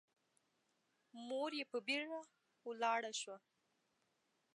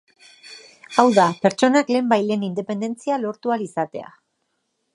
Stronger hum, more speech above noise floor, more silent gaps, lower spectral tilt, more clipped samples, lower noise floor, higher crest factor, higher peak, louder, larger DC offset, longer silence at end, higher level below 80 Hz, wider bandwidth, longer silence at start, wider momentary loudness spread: neither; second, 40 dB vs 53 dB; neither; second, -1 dB/octave vs -5.5 dB/octave; neither; first, -83 dBFS vs -73 dBFS; about the same, 22 dB vs 20 dB; second, -26 dBFS vs -2 dBFS; second, -43 LUFS vs -20 LUFS; neither; first, 1.2 s vs 0.9 s; second, under -90 dBFS vs -72 dBFS; about the same, 11 kHz vs 11 kHz; first, 1.15 s vs 0.45 s; about the same, 16 LU vs 16 LU